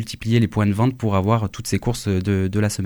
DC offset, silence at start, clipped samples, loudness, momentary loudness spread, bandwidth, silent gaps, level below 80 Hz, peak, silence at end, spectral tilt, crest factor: under 0.1%; 0 s; under 0.1%; -21 LUFS; 4 LU; 18 kHz; none; -44 dBFS; -6 dBFS; 0 s; -6.5 dB/octave; 14 dB